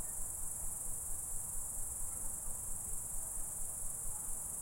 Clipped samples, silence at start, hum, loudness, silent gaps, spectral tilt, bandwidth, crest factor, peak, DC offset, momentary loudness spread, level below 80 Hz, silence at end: under 0.1%; 0 s; none; -40 LUFS; none; -2.5 dB/octave; 16.5 kHz; 14 dB; -26 dBFS; under 0.1%; 0 LU; -48 dBFS; 0 s